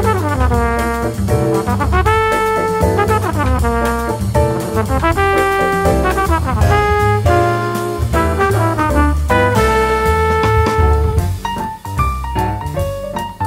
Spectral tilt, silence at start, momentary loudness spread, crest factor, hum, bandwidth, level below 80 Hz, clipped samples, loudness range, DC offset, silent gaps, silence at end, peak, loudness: -6 dB/octave; 0 s; 6 LU; 14 dB; none; 16.5 kHz; -22 dBFS; under 0.1%; 1 LU; under 0.1%; none; 0 s; 0 dBFS; -15 LUFS